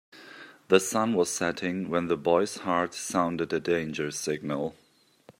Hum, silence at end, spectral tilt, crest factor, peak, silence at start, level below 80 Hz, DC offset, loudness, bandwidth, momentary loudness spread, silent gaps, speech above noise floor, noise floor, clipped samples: none; 0.1 s; -4 dB/octave; 24 dB; -4 dBFS; 0.15 s; -68 dBFS; under 0.1%; -28 LUFS; 16 kHz; 10 LU; none; 30 dB; -58 dBFS; under 0.1%